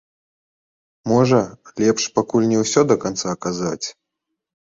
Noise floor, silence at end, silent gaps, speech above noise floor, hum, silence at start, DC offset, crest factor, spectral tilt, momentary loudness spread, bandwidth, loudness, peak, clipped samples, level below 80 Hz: -80 dBFS; 0.85 s; none; 62 dB; none; 1.05 s; under 0.1%; 18 dB; -5 dB/octave; 12 LU; 8 kHz; -19 LUFS; -2 dBFS; under 0.1%; -56 dBFS